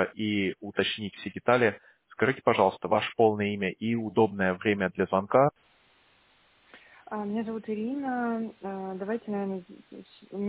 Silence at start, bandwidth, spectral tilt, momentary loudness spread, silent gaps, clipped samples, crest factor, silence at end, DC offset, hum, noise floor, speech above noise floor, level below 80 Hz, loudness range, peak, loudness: 0 s; 4 kHz; -10 dB/octave; 14 LU; none; under 0.1%; 22 dB; 0 s; under 0.1%; none; -64 dBFS; 36 dB; -62 dBFS; 8 LU; -8 dBFS; -28 LUFS